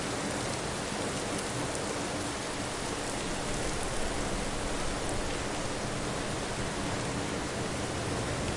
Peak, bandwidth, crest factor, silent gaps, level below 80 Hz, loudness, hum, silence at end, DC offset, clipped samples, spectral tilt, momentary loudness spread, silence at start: -16 dBFS; 11.5 kHz; 18 dB; none; -44 dBFS; -33 LUFS; none; 0 s; under 0.1%; under 0.1%; -3.5 dB/octave; 1 LU; 0 s